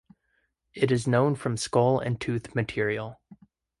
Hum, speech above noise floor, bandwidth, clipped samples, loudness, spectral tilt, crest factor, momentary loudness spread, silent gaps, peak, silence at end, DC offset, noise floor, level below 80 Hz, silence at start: none; 48 dB; 11.5 kHz; under 0.1%; -26 LUFS; -6 dB/octave; 20 dB; 8 LU; none; -8 dBFS; 0.45 s; under 0.1%; -74 dBFS; -58 dBFS; 0.75 s